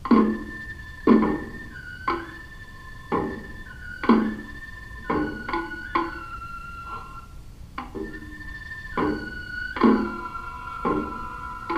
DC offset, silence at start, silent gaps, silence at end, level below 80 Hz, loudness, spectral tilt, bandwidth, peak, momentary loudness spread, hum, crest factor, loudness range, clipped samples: under 0.1%; 0 s; none; 0 s; -42 dBFS; -27 LUFS; -7 dB/octave; 11 kHz; -4 dBFS; 19 LU; none; 24 dB; 6 LU; under 0.1%